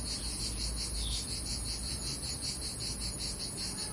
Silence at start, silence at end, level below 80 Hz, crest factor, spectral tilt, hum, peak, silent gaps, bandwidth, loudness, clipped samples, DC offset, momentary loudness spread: 0 s; 0 s; -42 dBFS; 14 dB; -2 dB/octave; none; -22 dBFS; none; 11.5 kHz; -35 LUFS; under 0.1%; under 0.1%; 1 LU